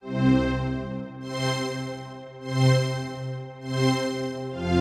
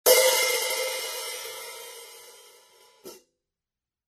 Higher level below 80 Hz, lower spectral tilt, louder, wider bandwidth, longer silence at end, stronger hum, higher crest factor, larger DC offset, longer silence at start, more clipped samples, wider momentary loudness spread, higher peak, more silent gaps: first, -44 dBFS vs -80 dBFS; first, -6 dB/octave vs 2 dB/octave; about the same, -26 LUFS vs -24 LUFS; second, 12 kHz vs 14 kHz; second, 0 s vs 0.95 s; neither; about the same, 18 dB vs 22 dB; neither; about the same, 0.05 s vs 0.05 s; neither; second, 13 LU vs 28 LU; about the same, -8 dBFS vs -6 dBFS; neither